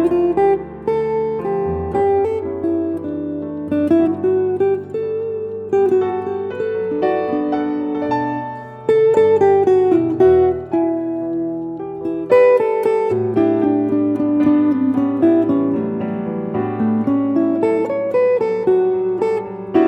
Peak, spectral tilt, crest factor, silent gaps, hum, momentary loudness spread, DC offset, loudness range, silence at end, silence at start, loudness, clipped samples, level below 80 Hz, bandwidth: -2 dBFS; -9 dB/octave; 14 dB; none; none; 10 LU; under 0.1%; 4 LU; 0 s; 0 s; -17 LUFS; under 0.1%; -48 dBFS; 8 kHz